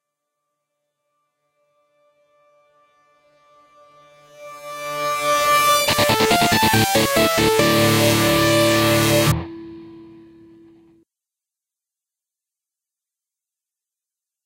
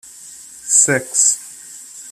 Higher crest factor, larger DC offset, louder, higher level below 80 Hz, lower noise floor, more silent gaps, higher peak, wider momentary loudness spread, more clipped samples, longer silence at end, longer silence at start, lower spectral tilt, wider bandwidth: about the same, 18 dB vs 20 dB; neither; second, -16 LUFS vs -13 LUFS; first, -46 dBFS vs -62 dBFS; first, -87 dBFS vs -38 dBFS; neither; about the same, -2 dBFS vs 0 dBFS; second, 15 LU vs 23 LU; neither; first, 4.4 s vs 0 s; first, 4.4 s vs 0.2 s; first, -3.5 dB/octave vs -1.5 dB/octave; about the same, 16 kHz vs 15 kHz